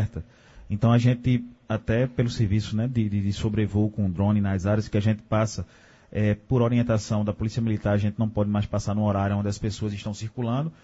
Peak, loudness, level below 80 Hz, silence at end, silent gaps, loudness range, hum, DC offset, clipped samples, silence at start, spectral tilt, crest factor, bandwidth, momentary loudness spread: -8 dBFS; -25 LUFS; -46 dBFS; 0.1 s; none; 1 LU; none; under 0.1%; under 0.1%; 0 s; -7.5 dB/octave; 18 dB; 8 kHz; 8 LU